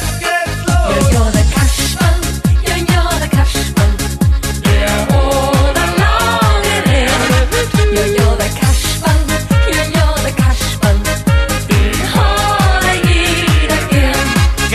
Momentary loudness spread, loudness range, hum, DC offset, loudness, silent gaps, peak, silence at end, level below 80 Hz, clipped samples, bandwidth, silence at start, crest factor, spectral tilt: 3 LU; 1 LU; none; under 0.1%; -13 LUFS; none; 0 dBFS; 0 s; -16 dBFS; under 0.1%; 14 kHz; 0 s; 10 dB; -4.5 dB/octave